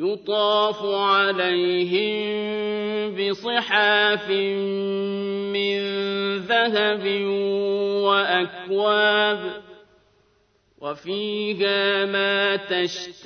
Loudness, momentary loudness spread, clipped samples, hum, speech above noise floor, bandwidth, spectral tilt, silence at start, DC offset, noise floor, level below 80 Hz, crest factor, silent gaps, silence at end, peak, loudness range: -22 LUFS; 8 LU; under 0.1%; none; 41 dB; 6.6 kHz; -4.5 dB/octave; 0 s; under 0.1%; -63 dBFS; -70 dBFS; 18 dB; none; 0 s; -6 dBFS; 3 LU